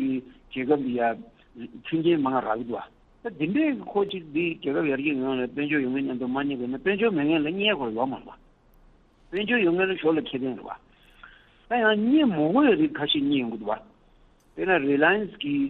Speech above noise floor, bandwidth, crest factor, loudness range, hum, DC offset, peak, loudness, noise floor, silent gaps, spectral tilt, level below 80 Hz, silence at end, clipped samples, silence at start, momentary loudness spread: 33 dB; 4.2 kHz; 18 dB; 4 LU; none; under 0.1%; -8 dBFS; -25 LUFS; -58 dBFS; none; -8.5 dB/octave; -60 dBFS; 0 s; under 0.1%; 0 s; 13 LU